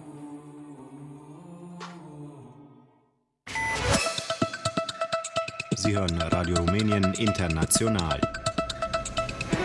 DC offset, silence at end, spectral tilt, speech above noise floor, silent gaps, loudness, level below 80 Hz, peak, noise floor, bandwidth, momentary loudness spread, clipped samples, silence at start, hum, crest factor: under 0.1%; 0 s; -4 dB/octave; 44 dB; none; -27 LUFS; -46 dBFS; -10 dBFS; -68 dBFS; 12 kHz; 21 LU; under 0.1%; 0 s; none; 20 dB